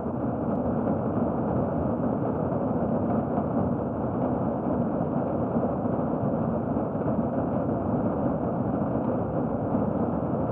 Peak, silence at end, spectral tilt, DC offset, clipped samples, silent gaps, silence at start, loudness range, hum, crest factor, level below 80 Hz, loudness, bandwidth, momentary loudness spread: -12 dBFS; 0 s; -13 dB/octave; under 0.1%; under 0.1%; none; 0 s; 0 LU; none; 14 dB; -46 dBFS; -27 LUFS; 3.3 kHz; 1 LU